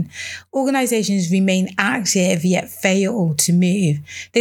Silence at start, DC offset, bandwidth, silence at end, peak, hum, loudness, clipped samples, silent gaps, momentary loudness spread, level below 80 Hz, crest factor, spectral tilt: 0 s; under 0.1%; 17.5 kHz; 0 s; 0 dBFS; none; -18 LUFS; under 0.1%; none; 6 LU; -68 dBFS; 18 dB; -4.5 dB/octave